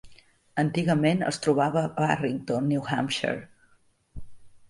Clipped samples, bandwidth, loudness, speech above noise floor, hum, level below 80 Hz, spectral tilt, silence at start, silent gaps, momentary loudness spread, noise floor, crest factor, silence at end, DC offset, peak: under 0.1%; 11.5 kHz; -26 LUFS; 38 dB; none; -56 dBFS; -6 dB/octave; 0.05 s; none; 5 LU; -63 dBFS; 18 dB; 0.1 s; under 0.1%; -10 dBFS